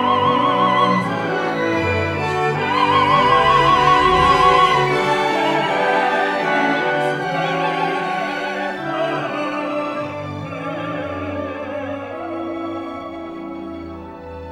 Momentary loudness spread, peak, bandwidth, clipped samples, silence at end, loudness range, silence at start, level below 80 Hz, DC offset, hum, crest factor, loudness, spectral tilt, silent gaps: 15 LU; -2 dBFS; 13.5 kHz; under 0.1%; 0 s; 12 LU; 0 s; -44 dBFS; under 0.1%; none; 16 dB; -18 LUFS; -5.5 dB/octave; none